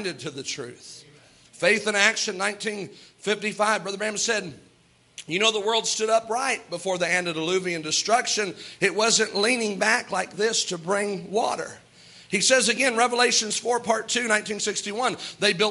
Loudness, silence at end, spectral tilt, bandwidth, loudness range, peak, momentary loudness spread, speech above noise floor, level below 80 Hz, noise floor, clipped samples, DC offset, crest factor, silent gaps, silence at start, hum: -23 LUFS; 0 s; -1.5 dB/octave; 11.5 kHz; 3 LU; -2 dBFS; 12 LU; 35 dB; -72 dBFS; -59 dBFS; under 0.1%; under 0.1%; 22 dB; none; 0 s; none